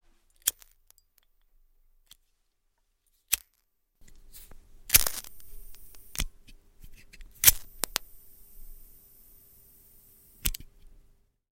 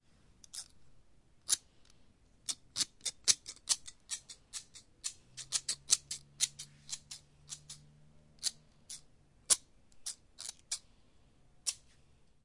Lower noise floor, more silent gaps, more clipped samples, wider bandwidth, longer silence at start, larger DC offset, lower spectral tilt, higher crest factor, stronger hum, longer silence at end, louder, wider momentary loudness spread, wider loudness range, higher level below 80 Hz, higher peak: first, -74 dBFS vs -67 dBFS; neither; neither; first, 17 kHz vs 11.5 kHz; about the same, 0.45 s vs 0.55 s; neither; first, 0 dB/octave vs 2 dB/octave; about the same, 34 dB vs 32 dB; neither; first, 0.9 s vs 0.7 s; first, -26 LUFS vs -36 LUFS; first, 26 LU vs 19 LU; first, 12 LU vs 3 LU; first, -46 dBFS vs -70 dBFS; first, 0 dBFS vs -8 dBFS